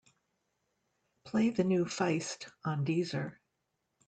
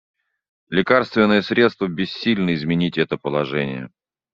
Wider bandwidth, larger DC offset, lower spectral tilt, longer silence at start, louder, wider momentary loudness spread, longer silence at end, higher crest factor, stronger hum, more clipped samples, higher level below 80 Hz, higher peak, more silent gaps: first, 9.2 kHz vs 7.4 kHz; neither; first, -6 dB/octave vs -4.5 dB/octave; first, 1.25 s vs 0.7 s; second, -33 LUFS vs -20 LUFS; about the same, 10 LU vs 8 LU; first, 0.75 s vs 0.45 s; about the same, 18 dB vs 18 dB; neither; neither; second, -74 dBFS vs -58 dBFS; second, -16 dBFS vs -2 dBFS; neither